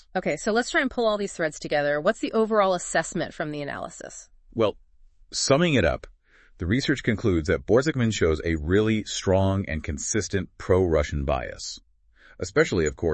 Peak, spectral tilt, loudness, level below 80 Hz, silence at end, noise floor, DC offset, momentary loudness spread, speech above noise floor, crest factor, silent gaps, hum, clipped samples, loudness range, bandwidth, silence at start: -6 dBFS; -5 dB/octave; -25 LUFS; -42 dBFS; 0 s; -56 dBFS; under 0.1%; 12 LU; 32 dB; 20 dB; none; none; under 0.1%; 3 LU; 8.8 kHz; 0.15 s